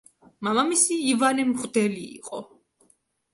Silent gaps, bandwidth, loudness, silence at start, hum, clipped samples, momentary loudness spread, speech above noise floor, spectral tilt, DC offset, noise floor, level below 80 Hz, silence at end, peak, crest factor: none; 11.5 kHz; -23 LUFS; 0.4 s; none; under 0.1%; 16 LU; 41 dB; -3 dB/octave; under 0.1%; -65 dBFS; -70 dBFS; 0.9 s; -6 dBFS; 20 dB